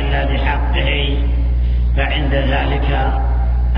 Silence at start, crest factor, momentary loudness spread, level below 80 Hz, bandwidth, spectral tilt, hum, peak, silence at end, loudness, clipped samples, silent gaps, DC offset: 0 s; 12 dB; 1 LU; -16 dBFS; 5 kHz; -9 dB/octave; 60 Hz at -15 dBFS; -2 dBFS; 0 s; -17 LUFS; under 0.1%; none; under 0.1%